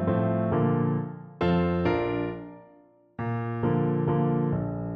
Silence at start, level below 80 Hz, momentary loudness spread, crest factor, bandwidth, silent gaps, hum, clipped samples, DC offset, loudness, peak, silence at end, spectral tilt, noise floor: 0 s; -50 dBFS; 11 LU; 14 dB; 5.2 kHz; none; none; under 0.1%; under 0.1%; -27 LUFS; -12 dBFS; 0 s; -10.5 dB/octave; -57 dBFS